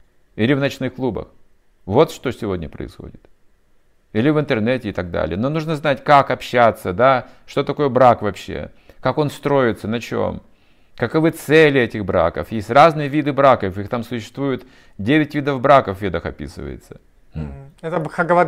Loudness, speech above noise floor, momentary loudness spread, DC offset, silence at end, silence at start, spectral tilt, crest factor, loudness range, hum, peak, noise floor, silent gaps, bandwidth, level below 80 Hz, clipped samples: -18 LUFS; 37 dB; 18 LU; under 0.1%; 0 s; 0.35 s; -6.5 dB/octave; 18 dB; 6 LU; none; 0 dBFS; -54 dBFS; none; 16 kHz; -46 dBFS; under 0.1%